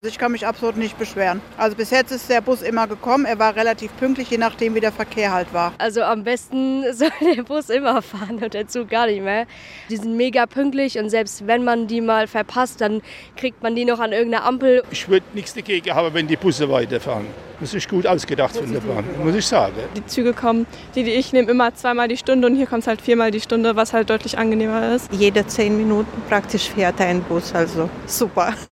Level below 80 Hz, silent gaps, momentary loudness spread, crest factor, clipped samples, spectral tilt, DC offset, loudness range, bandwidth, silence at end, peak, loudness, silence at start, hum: -50 dBFS; none; 7 LU; 18 dB; under 0.1%; -4.5 dB/octave; under 0.1%; 3 LU; 16.5 kHz; 0.05 s; -2 dBFS; -20 LUFS; 0.05 s; none